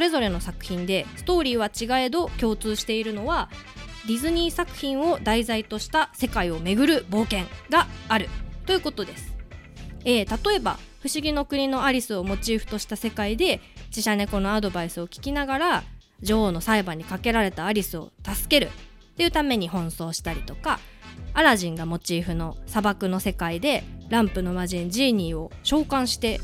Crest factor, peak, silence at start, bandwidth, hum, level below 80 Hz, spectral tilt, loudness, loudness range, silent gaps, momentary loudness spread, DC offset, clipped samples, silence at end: 22 dB; -2 dBFS; 0 s; 17 kHz; none; -38 dBFS; -4 dB/octave; -25 LUFS; 2 LU; none; 10 LU; under 0.1%; under 0.1%; 0 s